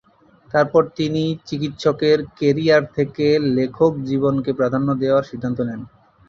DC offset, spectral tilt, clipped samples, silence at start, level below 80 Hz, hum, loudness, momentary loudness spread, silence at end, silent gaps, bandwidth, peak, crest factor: under 0.1%; -7 dB/octave; under 0.1%; 0.55 s; -54 dBFS; none; -19 LUFS; 8 LU; 0.4 s; none; 7.4 kHz; -2 dBFS; 16 dB